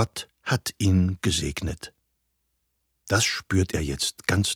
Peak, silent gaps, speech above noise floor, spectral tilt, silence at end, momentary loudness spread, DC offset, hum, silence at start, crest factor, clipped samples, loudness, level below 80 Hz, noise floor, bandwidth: -6 dBFS; none; 50 dB; -4 dB/octave; 0 s; 11 LU; under 0.1%; none; 0 s; 20 dB; under 0.1%; -25 LUFS; -44 dBFS; -75 dBFS; 16.5 kHz